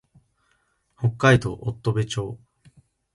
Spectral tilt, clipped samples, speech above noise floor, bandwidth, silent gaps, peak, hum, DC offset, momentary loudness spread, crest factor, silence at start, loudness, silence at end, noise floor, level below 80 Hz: -6 dB/octave; under 0.1%; 46 dB; 11.5 kHz; none; -2 dBFS; none; under 0.1%; 14 LU; 24 dB; 1 s; -23 LUFS; 0.8 s; -68 dBFS; -50 dBFS